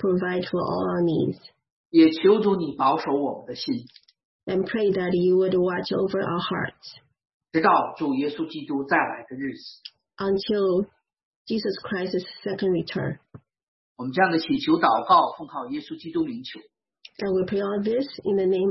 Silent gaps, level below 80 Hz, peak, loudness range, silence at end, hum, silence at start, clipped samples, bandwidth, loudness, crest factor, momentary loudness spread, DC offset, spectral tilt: 1.72-1.90 s, 4.25-4.39 s, 7.34-7.40 s, 11.25-11.45 s, 13.63-13.95 s; -64 dBFS; -6 dBFS; 5 LU; 0 s; none; 0 s; under 0.1%; 6 kHz; -24 LUFS; 18 dB; 14 LU; under 0.1%; -8 dB/octave